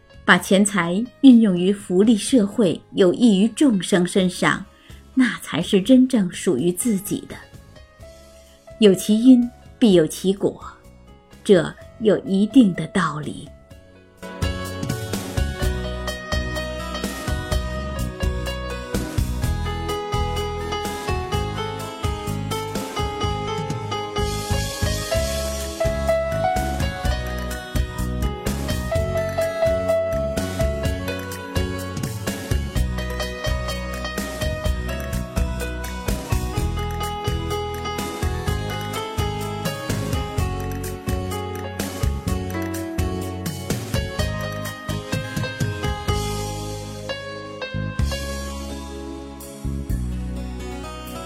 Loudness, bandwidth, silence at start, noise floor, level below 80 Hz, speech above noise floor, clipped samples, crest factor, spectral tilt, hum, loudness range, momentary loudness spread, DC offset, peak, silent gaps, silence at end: -22 LUFS; 16.5 kHz; 0.15 s; -47 dBFS; -32 dBFS; 30 dB; under 0.1%; 22 dB; -5.5 dB/octave; none; 8 LU; 13 LU; under 0.1%; 0 dBFS; none; 0 s